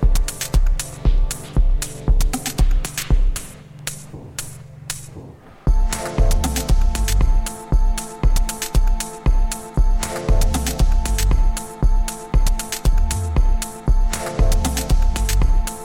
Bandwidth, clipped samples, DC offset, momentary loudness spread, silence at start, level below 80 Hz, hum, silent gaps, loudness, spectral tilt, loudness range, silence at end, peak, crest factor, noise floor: 16.5 kHz; under 0.1%; under 0.1%; 10 LU; 0 s; -18 dBFS; none; none; -22 LUFS; -4.5 dB/octave; 4 LU; 0 s; -4 dBFS; 14 dB; -39 dBFS